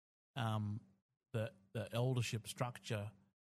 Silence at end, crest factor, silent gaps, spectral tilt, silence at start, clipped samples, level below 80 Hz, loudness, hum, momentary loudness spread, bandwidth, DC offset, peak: 0.35 s; 20 dB; 1.02-1.09 s; -5.5 dB/octave; 0.35 s; under 0.1%; -76 dBFS; -43 LUFS; none; 10 LU; 15 kHz; under 0.1%; -22 dBFS